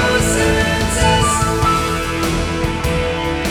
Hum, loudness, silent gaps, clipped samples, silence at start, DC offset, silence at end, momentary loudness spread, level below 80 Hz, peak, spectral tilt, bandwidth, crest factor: none; -16 LUFS; none; under 0.1%; 0 s; under 0.1%; 0 s; 5 LU; -26 dBFS; -2 dBFS; -4 dB/octave; 20 kHz; 14 dB